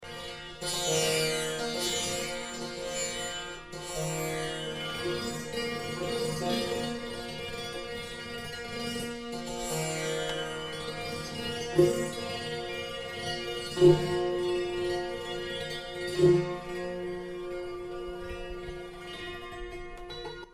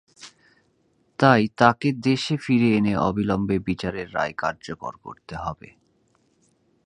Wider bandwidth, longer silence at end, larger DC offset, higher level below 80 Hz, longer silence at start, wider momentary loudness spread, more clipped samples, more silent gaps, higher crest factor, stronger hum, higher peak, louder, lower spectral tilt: first, 15.5 kHz vs 10.5 kHz; second, 0 s vs 1.3 s; neither; about the same, -52 dBFS vs -52 dBFS; second, 0 s vs 0.2 s; second, 14 LU vs 17 LU; neither; neither; about the same, 24 dB vs 24 dB; neither; second, -8 dBFS vs 0 dBFS; second, -32 LUFS vs -22 LUFS; second, -4 dB/octave vs -6.5 dB/octave